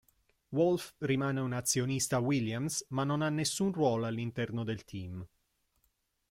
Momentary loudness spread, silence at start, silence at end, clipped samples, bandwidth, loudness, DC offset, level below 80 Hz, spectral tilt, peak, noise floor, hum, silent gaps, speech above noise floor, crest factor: 9 LU; 0.5 s; 1.05 s; under 0.1%; 16.5 kHz; -33 LUFS; under 0.1%; -66 dBFS; -5 dB/octave; -16 dBFS; -77 dBFS; none; none; 45 dB; 18 dB